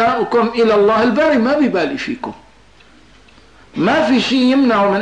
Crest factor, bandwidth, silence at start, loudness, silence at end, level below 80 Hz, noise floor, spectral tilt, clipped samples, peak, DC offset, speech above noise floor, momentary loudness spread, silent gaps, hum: 10 dB; 9.6 kHz; 0 s; -14 LUFS; 0 s; -50 dBFS; -47 dBFS; -5.5 dB/octave; under 0.1%; -6 dBFS; 0.3%; 33 dB; 11 LU; none; none